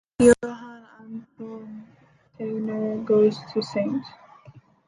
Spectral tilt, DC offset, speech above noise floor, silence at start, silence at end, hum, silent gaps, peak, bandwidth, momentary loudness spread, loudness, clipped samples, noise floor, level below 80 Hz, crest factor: -5.5 dB/octave; under 0.1%; 28 dB; 0.2 s; 0.3 s; none; none; -4 dBFS; 11.5 kHz; 23 LU; -23 LUFS; under 0.1%; -51 dBFS; -54 dBFS; 22 dB